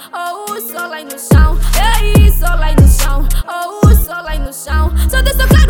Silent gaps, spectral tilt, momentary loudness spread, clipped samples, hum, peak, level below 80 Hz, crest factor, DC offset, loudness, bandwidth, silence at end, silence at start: none; -5 dB/octave; 12 LU; under 0.1%; none; 0 dBFS; -12 dBFS; 10 dB; under 0.1%; -13 LUFS; over 20 kHz; 0 s; 0 s